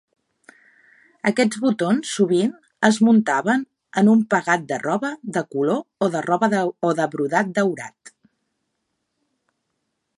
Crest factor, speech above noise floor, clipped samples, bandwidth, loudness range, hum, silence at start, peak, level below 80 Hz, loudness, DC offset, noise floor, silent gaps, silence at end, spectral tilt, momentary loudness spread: 20 dB; 56 dB; under 0.1%; 11.5 kHz; 5 LU; none; 1.25 s; -2 dBFS; -70 dBFS; -20 LUFS; under 0.1%; -75 dBFS; none; 2.3 s; -5.5 dB/octave; 9 LU